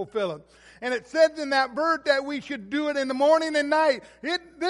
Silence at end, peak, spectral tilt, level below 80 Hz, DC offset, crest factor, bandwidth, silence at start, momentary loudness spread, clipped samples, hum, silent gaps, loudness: 0 s; -8 dBFS; -3.5 dB/octave; -66 dBFS; under 0.1%; 18 dB; 11.5 kHz; 0 s; 11 LU; under 0.1%; none; none; -24 LUFS